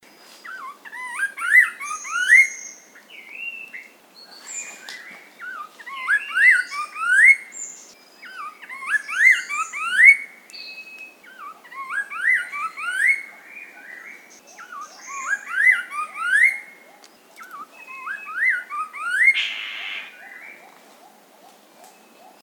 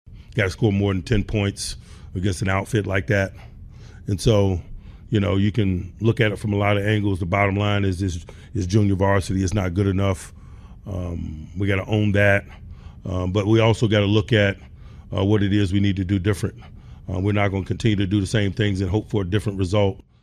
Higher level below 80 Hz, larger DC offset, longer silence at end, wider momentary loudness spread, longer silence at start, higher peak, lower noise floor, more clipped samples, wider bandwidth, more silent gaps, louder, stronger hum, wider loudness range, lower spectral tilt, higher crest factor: second, under -90 dBFS vs -40 dBFS; neither; first, 1.9 s vs 0.2 s; first, 26 LU vs 12 LU; first, 0.45 s vs 0.05 s; about the same, -2 dBFS vs -4 dBFS; first, -50 dBFS vs -41 dBFS; neither; first, 19 kHz vs 12 kHz; neither; first, -17 LUFS vs -22 LUFS; neither; first, 6 LU vs 3 LU; second, 2.5 dB/octave vs -6.5 dB/octave; about the same, 22 dB vs 18 dB